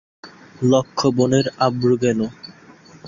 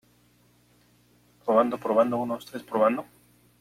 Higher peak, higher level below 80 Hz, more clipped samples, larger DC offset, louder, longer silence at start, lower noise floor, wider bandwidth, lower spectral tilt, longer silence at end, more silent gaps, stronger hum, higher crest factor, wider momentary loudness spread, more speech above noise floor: first, -2 dBFS vs -8 dBFS; first, -56 dBFS vs -70 dBFS; neither; neither; first, -19 LUFS vs -26 LUFS; second, 0.25 s vs 1.45 s; second, -46 dBFS vs -62 dBFS; second, 7.4 kHz vs 15 kHz; about the same, -6 dB/octave vs -6.5 dB/octave; second, 0 s vs 0.55 s; neither; second, none vs 60 Hz at -45 dBFS; about the same, 18 dB vs 20 dB; about the same, 10 LU vs 11 LU; second, 28 dB vs 37 dB